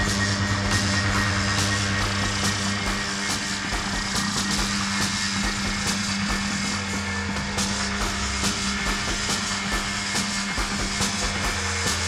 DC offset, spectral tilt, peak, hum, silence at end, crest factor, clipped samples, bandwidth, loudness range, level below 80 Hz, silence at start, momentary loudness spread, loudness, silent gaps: under 0.1%; -3 dB/octave; -8 dBFS; none; 0 s; 16 dB; under 0.1%; 15.5 kHz; 2 LU; -36 dBFS; 0 s; 3 LU; -24 LUFS; none